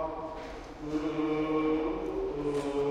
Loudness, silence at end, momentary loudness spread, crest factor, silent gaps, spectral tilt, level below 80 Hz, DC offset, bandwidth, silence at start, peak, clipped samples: -32 LUFS; 0 s; 12 LU; 14 dB; none; -7 dB/octave; -50 dBFS; under 0.1%; 10.5 kHz; 0 s; -18 dBFS; under 0.1%